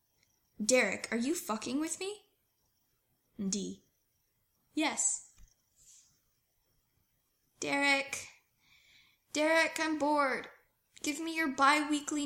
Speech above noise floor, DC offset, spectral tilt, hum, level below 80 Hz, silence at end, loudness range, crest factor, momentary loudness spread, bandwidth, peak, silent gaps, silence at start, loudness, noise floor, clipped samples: 45 dB; under 0.1%; -2 dB/octave; none; -74 dBFS; 0 s; 7 LU; 24 dB; 13 LU; 16.5 kHz; -12 dBFS; none; 0.6 s; -32 LUFS; -77 dBFS; under 0.1%